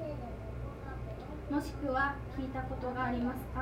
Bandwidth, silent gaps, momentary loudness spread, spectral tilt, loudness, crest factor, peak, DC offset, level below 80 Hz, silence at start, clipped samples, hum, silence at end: 16 kHz; none; 10 LU; -7 dB/octave; -37 LUFS; 18 dB; -20 dBFS; under 0.1%; -46 dBFS; 0 s; under 0.1%; none; 0 s